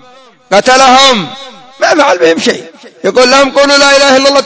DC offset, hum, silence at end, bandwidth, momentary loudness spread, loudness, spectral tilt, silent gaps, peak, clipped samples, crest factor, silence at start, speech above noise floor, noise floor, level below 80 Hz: under 0.1%; none; 0 s; 8 kHz; 11 LU; -6 LUFS; -2 dB/octave; none; 0 dBFS; 3%; 8 dB; 0.5 s; 32 dB; -39 dBFS; -46 dBFS